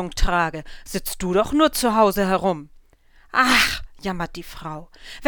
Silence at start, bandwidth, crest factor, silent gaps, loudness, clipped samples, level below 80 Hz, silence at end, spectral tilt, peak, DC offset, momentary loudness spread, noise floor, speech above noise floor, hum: 0 s; over 20 kHz; 18 dB; none; -21 LUFS; under 0.1%; -32 dBFS; 0 s; -4 dB/octave; -4 dBFS; under 0.1%; 18 LU; -53 dBFS; 32 dB; none